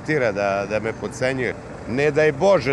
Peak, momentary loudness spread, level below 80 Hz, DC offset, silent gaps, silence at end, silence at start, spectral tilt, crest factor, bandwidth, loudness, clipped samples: -6 dBFS; 10 LU; -48 dBFS; under 0.1%; none; 0 s; 0 s; -6 dB/octave; 14 dB; 11.5 kHz; -21 LUFS; under 0.1%